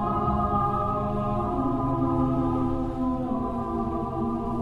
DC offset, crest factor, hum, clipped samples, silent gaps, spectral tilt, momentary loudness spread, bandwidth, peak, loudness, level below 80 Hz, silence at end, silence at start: under 0.1%; 14 dB; none; under 0.1%; none; -10 dB/octave; 4 LU; 5.6 kHz; -12 dBFS; -27 LUFS; -38 dBFS; 0 s; 0 s